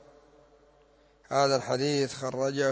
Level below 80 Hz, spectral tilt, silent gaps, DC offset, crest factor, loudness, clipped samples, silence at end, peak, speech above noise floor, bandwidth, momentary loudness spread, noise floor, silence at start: -68 dBFS; -4.5 dB/octave; none; under 0.1%; 18 dB; -28 LUFS; under 0.1%; 0 s; -12 dBFS; 34 dB; 8 kHz; 6 LU; -62 dBFS; 1.3 s